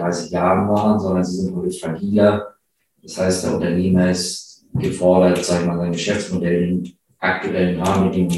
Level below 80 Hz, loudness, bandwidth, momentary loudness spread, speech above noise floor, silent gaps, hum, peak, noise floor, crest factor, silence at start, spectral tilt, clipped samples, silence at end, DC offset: -48 dBFS; -19 LUFS; 12.5 kHz; 9 LU; 47 dB; none; none; -2 dBFS; -65 dBFS; 16 dB; 0 s; -6 dB/octave; under 0.1%; 0 s; under 0.1%